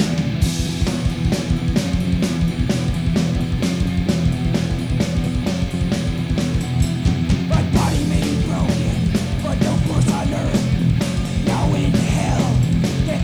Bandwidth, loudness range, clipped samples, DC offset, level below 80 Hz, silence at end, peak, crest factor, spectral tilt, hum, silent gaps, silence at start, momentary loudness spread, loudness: 15 kHz; 2 LU; under 0.1%; under 0.1%; -26 dBFS; 0 s; -4 dBFS; 14 dB; -6.5 dB/octave; none; none; 0 s; 3 LU; -19 LUFS